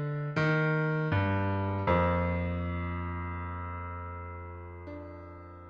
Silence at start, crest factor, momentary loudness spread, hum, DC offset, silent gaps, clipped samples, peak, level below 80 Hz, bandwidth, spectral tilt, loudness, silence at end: 0 s; 18 dB; 17 LU; none; under 0.1%; none; under 0.1%; -14 dBFS; -48 dBFS; 6.8 kHz; -9 dB/octave; -31 LUFS; 0 s